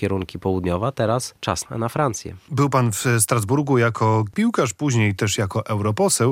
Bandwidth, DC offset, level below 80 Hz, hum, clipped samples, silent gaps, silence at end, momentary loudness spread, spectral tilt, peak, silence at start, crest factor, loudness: 16 kHz; under 0.1%; -54 dBFS; none; under 0.1%; none; 0 s; 7 LU; -5 dB/octave; -4 dBFS; 0 s; 16 dB; -21 LUFS